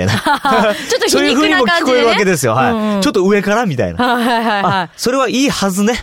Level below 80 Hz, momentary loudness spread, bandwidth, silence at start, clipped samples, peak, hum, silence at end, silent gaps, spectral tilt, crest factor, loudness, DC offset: -44 dBFS; 4 LU; 17.5 kHz; 0 s; under 0.1%; -4 dBFS; none; 0 s; none; -4 dB/octave; 10 dB; -13 LUFS; 0.2%